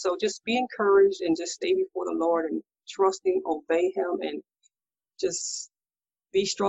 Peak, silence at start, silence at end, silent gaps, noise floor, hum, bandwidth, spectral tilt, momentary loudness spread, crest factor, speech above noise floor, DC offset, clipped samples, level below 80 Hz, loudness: -10 dBFS; 0 s; 0 s; none; under -90 dBFS; none; 8.4 kHz; -3 dB/octave; 12 LU; 16 dB; over 64 dB; under 0.1%; under 0.1%; -68 dBFS; -26 LUFS